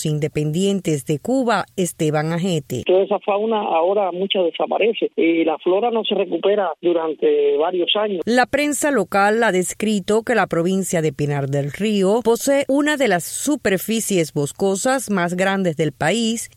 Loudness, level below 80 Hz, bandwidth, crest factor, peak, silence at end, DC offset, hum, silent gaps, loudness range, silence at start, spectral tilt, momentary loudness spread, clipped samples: -19 LUFS; -56 dBFS; 16.5 kHz; 16 dB; -4 dBFS; 0.1 s; under 0.1%; none; none; 2 LU; 0 s; -4.5 dB/octave; 4 LU; under 0.1%